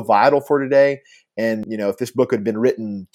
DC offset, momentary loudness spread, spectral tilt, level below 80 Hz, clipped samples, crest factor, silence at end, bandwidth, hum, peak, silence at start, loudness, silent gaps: under 0.1%; 10 LU; -6.5 dB/octave; -66 dBFS; under 0.1%; 18 dB; 0.1 s; 15.5 kHz; none; -2 dBFS; 0 s; -19 LUFS; none